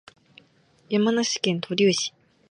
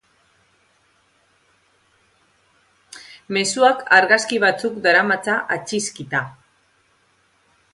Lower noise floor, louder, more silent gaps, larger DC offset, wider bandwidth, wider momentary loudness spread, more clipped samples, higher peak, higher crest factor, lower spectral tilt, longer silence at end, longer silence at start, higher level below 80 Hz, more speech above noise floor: about the same, -60 dBFS vs -61 dBFS; second, -23 LUFS vs -18 LUFS; neither; neither; about the same, 11 kHz vs 11.5 kHz; second, 6 LU vs 17 LU; neither; second, -6 dBFS vs 0 dBFS; about the same, 20 dB vs 22 dB; first, -4 dB/octave vs -2.5 dB/octave; second, 0.4 s vs 1.4 s; second, 0.9 s vs 2.95 s; about the same, -72 dBFS vs -68 dBFS; second, 37 dB vs 43 dB